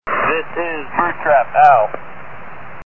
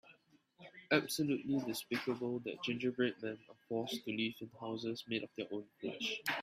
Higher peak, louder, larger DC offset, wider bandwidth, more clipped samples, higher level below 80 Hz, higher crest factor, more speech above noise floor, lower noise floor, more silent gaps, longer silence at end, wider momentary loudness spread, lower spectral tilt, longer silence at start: first, 0 dBFS vs -16 dBFS; first, -15 LUFS vs -39 LUFS; first, 4% vs under 0.1%; second, 5.2 kHz vs 15.5 kHz; neither; first, -50 dBFS vs -80 dBFS; second, 16 dB vs 24 dB; second, 20 dB vs 29 dB; second, -35 dBFS vs -69 dBFS; neither; about the same, 0 s vs 0 s; first, 24 LU vs 11 LU; first, -6.5 dB/octave vs -4.5 dB/octave; about the same, 0 s vs 0.05 s